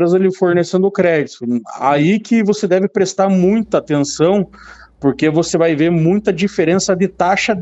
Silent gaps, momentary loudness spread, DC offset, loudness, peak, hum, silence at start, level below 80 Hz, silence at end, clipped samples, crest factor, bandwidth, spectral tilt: none; 5 LU; under 0.1%; -15 LUFS; 0 dBFS; none; 0 s; -50 dBFS; 0 s; under 0.1%; 14 dB; 8.2 kHz; -6 dB/octave